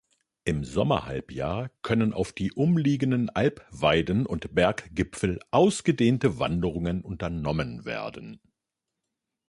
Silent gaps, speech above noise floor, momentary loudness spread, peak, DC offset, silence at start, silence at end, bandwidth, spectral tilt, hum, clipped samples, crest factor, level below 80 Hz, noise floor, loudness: none; 60 dB; 10 LU; -8 dBFS; under 0.1%; 0.45 s; 1.15 s; 11.5 kHz; -6.5 dB/octave; none; under 0.1%; 20 dB; -46 dBFS; -86 dBFS; -27 LUFS